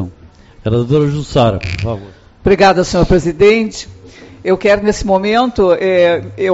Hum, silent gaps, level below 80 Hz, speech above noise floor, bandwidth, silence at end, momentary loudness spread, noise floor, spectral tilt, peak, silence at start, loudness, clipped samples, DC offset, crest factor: none; none; -30 dBFS; 28 dB; 8 kHz; 0 s; 13 LU; -40 dBFS; -5 dB/octave; 0 dBFS; 0 s; -13 LUFS; under 0.1%; under 0.1%; 12 dB